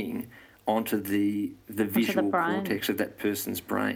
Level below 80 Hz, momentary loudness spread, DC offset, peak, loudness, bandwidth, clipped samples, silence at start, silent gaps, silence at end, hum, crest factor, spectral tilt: -66 dBFS; 9 LU; under 0.1%; -12 dBFS; -29 LUFS; 17 kHz; under 0.1%; 0 s; none; 0 s; none; 18 dB; -5 dB/octave